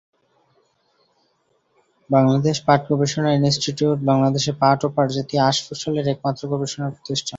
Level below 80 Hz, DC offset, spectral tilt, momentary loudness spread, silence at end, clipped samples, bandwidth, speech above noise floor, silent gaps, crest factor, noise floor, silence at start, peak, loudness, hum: -58 dBFS; under 0.1%; -5.5 dB/octave; 7 LU; 0 s; under 0.1%; 8 kHz; 46 dB; none; 18 dB; -66 dBFS; 2.1 s; -2 dBFS; -20 LUFS; none